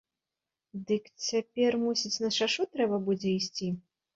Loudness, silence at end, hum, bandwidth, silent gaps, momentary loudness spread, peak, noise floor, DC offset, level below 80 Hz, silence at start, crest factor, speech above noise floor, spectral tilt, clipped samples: -30 LUFS; 0.35 s; none; 7.8 kHz; none; 8 LU; -16 dBFS; -90 dBFS; under 0.1%; -72 dBFS; 0.75 s; 16 dB; 60 dB; -4 dB/octave; under 0.1%